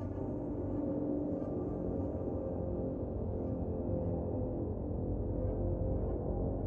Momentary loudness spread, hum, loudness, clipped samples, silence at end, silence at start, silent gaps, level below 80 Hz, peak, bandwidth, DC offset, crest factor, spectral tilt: 3 LU; none; -37 LUFS; under 0.1%; 0 s; 0 s; none; -44 dBFS; -22 dBFS; 2.7 kHz; under 0.1%; 12 dB; -13 dB/octave